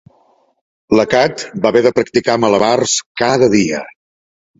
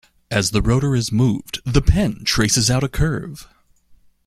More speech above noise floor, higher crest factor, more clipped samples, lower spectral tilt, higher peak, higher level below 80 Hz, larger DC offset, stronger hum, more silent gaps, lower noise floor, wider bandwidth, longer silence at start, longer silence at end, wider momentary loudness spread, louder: first, 42 dB vs 34 dB; about the same, 14 dB vs 18 dB; neither; about the same, -4 dB/octave vs -4.5 dB/octave; about the same, 0 dBFS vs -2 dBFS; second, -50 dBFS vs -28 dBFS; neither; neither; first, 3.06-3.15 s vs none; about the same, -55 dBFS vs -52 dBFS; second, 8 kHz vs 15.5 kHz; first, 0.9 s vs 0.3 s; about the same, 0.7 s vs 0.8 s; second, 6 LU vs 9 LU; first, -14 LUFS vs -19 LUFS